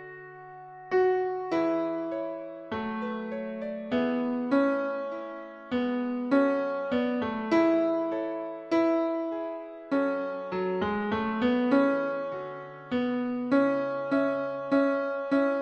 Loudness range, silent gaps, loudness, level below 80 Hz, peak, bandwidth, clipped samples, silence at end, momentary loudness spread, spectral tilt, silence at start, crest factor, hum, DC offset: 3 LU; none; -28 LUFS; -66 dBFS; -12 dBFS; 7.6 kHz; under 0.1%; 0 s; 12 LU; -7.5 dB/octave; 0 s; 16 dB; none; under 0.1%